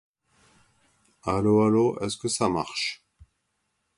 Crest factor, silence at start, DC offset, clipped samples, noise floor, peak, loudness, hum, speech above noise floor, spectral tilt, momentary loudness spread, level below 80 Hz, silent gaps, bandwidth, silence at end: 20 dB; 1.25 s; under 0.1%; under 0.1%; -76 dBFS; -8 dBFS; -25 LUFS; none; 52 dB; -5 dB/octave; 11 LU; -54 dBFS; none; 11.5 kHz; 1 s